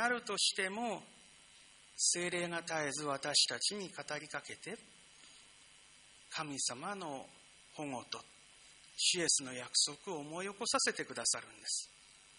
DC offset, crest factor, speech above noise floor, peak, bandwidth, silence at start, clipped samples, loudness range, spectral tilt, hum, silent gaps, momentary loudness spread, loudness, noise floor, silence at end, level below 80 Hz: under 0.1%; 24 dB; 24 dB; -16 dBFS; 10.5 kHz; 0 s; under 0.1%; 9 LU; -1 dB/octave; none; none; 17 LU; -36 LUFS; -62 dBFS; 0 s; -80 dBFS